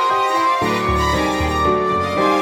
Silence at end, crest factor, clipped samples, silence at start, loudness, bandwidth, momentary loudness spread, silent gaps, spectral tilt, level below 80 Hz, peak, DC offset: 0 s; 12 dB; under 0.1%; 0 s; -17 LUFS; 18 kHz; 2 LU; none; -5 dB/octave; -32 dBFS; -4 dBFS; under 0.1%